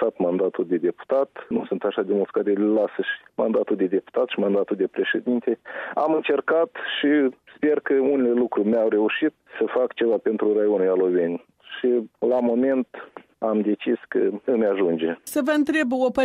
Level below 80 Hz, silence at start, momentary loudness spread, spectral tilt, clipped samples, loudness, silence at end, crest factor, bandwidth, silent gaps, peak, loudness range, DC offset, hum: -68 dBFS; 0 s; 6 LU; -6 dB/octave; under 0.1%; -23 LUFS; 0 s; 12 dB; 13.5 kHz; none; -10 dBFS; 2 LU; under 0.1%; none